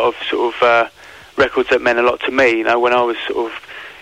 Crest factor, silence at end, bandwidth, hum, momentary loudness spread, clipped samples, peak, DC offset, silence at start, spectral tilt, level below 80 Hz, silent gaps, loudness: 12 dB; 0.05 s; 11.5 kHz; none; 11 LU; under 0.1%; -4 dBFS; 0.1%; 0 s; -4 dB/octave; -50 dBFS; none; -15 LUFS